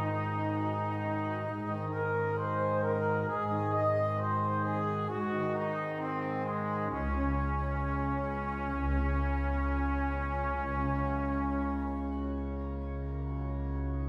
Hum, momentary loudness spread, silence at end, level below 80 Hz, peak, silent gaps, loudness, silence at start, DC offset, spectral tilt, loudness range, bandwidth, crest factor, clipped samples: none; 5 LU; 0 s; -38 dBFS; -18 dBFS; none; -33 LUFS; 0 s; under 0.1%; -9.5 dB/octave; 2 LU; 5.6 kHz; 14 dB; under 0.1%